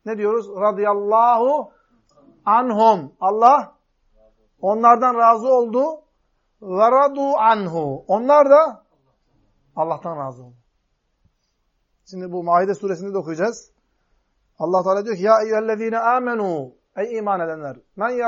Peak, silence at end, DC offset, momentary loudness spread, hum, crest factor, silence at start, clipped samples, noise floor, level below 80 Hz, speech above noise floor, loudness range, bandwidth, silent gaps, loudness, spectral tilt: 0 dBFS; 0 s; under 0.1%; 15 LU; none; 18 dB; 0.05 s; under 0.1%; -69 dBFS; -66 dBFS; 51 dB; 9 LU; 7.6 kHz; none; -18 LUFS; -6.5 dB/octave